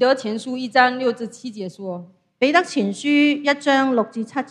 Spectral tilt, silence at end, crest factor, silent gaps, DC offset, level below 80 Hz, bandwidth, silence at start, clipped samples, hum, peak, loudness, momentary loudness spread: -4.5 dB/octave; 0.05 s; 20 dB; none; under 0.1%; -72 dBFS; 10.5 kHz; 0 s; under 0.1%; none; 0 dBFS; -19 LUFS; 15 LU